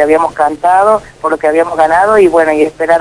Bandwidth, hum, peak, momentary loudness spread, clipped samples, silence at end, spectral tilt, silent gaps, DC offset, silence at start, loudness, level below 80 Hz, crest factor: 11 kHz; none; 0 dBFS; 6 LU; 0.9%; 0 s; -5 dB/octave; none; under 0.1%; 0 s; -10 LUFS; -42 dBFS; 10 dB